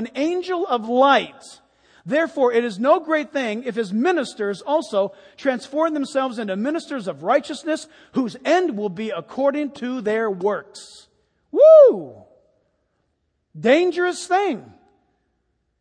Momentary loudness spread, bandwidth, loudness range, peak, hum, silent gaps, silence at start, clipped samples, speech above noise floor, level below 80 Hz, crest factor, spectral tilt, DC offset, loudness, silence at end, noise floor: 12 LU; 10 kHz; 6 LU; -2 dBFS; none; none; 0 s; under 0.1%; 52 dB; -72 dBFS; 18 dB; -5 dB/octave; under 0.1%; -20 LUFS; 1.15 s; -71 dBFS